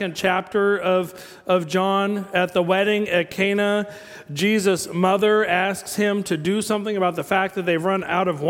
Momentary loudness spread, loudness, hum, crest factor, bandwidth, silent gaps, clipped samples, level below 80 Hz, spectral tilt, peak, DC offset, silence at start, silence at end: 5 LU; -21 LUFS; none; 16 dB; 17 kHz; none; under 0.1%; -62 dBFS; -5 dB/octave; -4 dBFS; under 0.1%; 0 s; 0 s